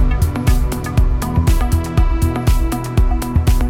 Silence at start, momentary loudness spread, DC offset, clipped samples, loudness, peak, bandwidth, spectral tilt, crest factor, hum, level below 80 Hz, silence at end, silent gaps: 0 s; 2 LU; under 0.1%; under 0.1%; -17 LUFS; -2 dBFS; 16.5 kHz; -6.5 dB/octave; 12 dB; none; -16 dBFS; 0 s; none